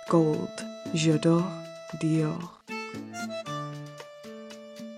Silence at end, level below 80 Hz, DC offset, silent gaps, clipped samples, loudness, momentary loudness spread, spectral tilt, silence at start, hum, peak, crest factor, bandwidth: 0 s; -70 dBFS; under 0.1%; none; under 0.1%; -29 LUFS; 19 LU; -6 dB/octave; 0 s; none; -12 dBFS; 18 dB; 11.5 kHz